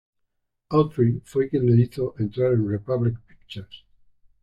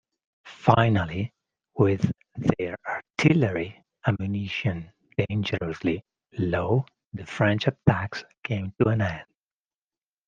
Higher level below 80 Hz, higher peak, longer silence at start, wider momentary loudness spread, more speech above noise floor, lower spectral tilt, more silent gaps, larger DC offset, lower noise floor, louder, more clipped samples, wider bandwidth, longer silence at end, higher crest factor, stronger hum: about the same, -54 dBFS vs -56 dBFS; second, -6 dBFS vs -2 dBFS; first, 0.7 s vs 0.45 s; first, 19 LU vs 14 LU; second, 53 dB vs over 66 dB; first, -9.5 dB/octave vs -7.5 dB/octave; second, none vs 8.38-8.42 s; neither; second, -75 dBFS vs under -90 dBFS; first, -23 LUFS vs -26 LUFS; neither; about the same, 8.2 kHz vs 7.6 kHz; second, 0.65 s vs 1.05 s; second, 18 dB vs 24 dB; first, 50 Hz at -50 dBFS vs none